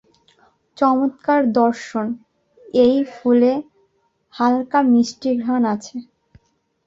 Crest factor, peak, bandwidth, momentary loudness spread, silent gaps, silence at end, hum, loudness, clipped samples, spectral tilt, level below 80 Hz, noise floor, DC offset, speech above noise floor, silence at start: 16 dB; -4 dBFS; 7.8 kHz; 11 LU; none; 0.85 s; none; -18 LUFS; under 0.1%; -5.5 dB/octave; -60 dBFS; -64 dBFS; under 0.1%; 47 dB; 0.8 s